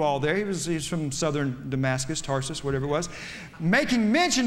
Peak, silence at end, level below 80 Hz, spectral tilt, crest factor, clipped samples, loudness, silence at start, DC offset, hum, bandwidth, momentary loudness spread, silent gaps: -10 dBFS; 0 s; -48 dBFS; -4.5 dB/octave; 16 dB; under 0.1%; -26 LUFS; 0 s; under 0.1%; none; 16 kHz; 7 LU; none